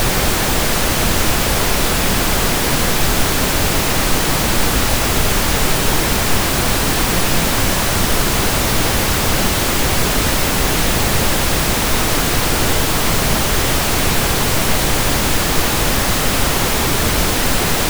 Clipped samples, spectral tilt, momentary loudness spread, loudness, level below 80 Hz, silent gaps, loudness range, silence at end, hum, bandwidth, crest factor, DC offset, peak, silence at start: under 0.1%; -3 dB/octave; 0 LU; -15 LUFS; -22 dBFS; none; 0 LU; 0 s; none; over 20 kHz; 14 dB; under 0.1%; -2 dBFS; 0 s